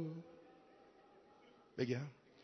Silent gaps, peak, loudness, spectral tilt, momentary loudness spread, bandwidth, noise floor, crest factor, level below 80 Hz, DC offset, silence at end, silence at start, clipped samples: none; -24 dBFS; -45 LUFS; -6.5 dB/octave; 24 LU; 6.2 kHz; -66 dBFS; 24 dB; -84 dBFS; under 0.1%; 0 s; 0 s; under 0.1%